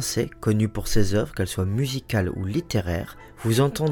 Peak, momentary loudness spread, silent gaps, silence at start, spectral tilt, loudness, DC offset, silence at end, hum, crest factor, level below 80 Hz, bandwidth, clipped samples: -6 dBFS; 7 LU; none; 0 s; -5.5 dB/octave; -25 LUFS; under 0.1%; 0 s; none; 16 dB; -38 dBFS; 18.5 kHz; under 0.1%